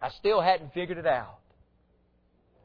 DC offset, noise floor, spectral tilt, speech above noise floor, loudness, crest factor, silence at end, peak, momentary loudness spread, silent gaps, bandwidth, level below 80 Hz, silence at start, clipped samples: under 0.1%; -67 dBFS; -7 dB/octave; 40 dB; -27 LUFS; 18 dB; 1.3 s; -12 dBFS; 10 LU; none; 5.4 kHz; -60 dBFS; 0 s; under 0.1%